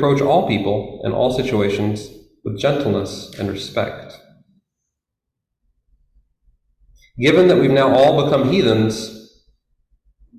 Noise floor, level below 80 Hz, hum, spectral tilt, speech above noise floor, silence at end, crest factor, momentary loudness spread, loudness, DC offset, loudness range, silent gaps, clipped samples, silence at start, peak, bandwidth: -81 dBFS; -48 dBFS; none; -6.5 dB/octave; 65 dB; 1.15 s; 16 dB; 16 LU; -17 LUFS; under 0.1%; 14 LU; none; under 0.1%; 0 s; -2 dBFS; 15 kHz